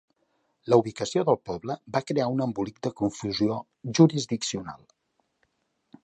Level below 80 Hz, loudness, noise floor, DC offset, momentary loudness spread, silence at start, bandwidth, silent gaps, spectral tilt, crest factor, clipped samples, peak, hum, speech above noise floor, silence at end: -62 dBFS; -26 LUFS; -73 dBFS; under 0.1%; 13 LU; 0.65 s; 9.2 kHz; none; -6 dB/octave; 22 dB; under 0.1%; -4 dBFS; none; 47 dB; 1.3 s